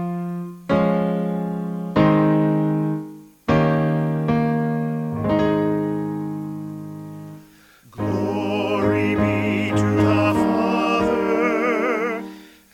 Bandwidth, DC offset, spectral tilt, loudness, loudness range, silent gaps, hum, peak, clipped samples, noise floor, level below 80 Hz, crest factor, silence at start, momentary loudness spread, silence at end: 15.5 kHz; under 0.1%; -8 dB/octave; -21 LUFS; 6 LU; none; none; -2 dBFS; under 0.1%; -50 dBFS; -48 dBFS; 18 dB; 0 s; 13 LU; 0.25 s